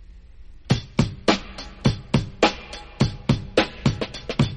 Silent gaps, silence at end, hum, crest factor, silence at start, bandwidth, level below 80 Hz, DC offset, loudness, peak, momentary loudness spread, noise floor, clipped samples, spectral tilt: none; 0 s; none; 20 dB; 0 s; 11 kHz; -38 dBFS; under 0.1%; -24 LUFS; -4 dBFS; 7 LU; -42 dBFS; under 0.1%; -6 dB/octave